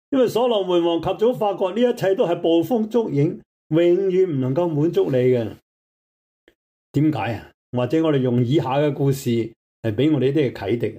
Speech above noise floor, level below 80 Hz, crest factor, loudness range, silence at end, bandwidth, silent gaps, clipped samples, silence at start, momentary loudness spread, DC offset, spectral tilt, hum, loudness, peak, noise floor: over 71 dB; -60 dBFS; 12 dB; 4 LU; 0 s; 16 kHz; 3.46-3.70 s, 5.62-6.47 s, 6.55-6.94 s, 7.54-7.73 s, 9.56-9.83 s; under 0.1%; 0.1 s; 8 LU; under 0.1%; -7.5 dB/octave; none; -20 LUFS; -8 dBFS; under -90 dBFS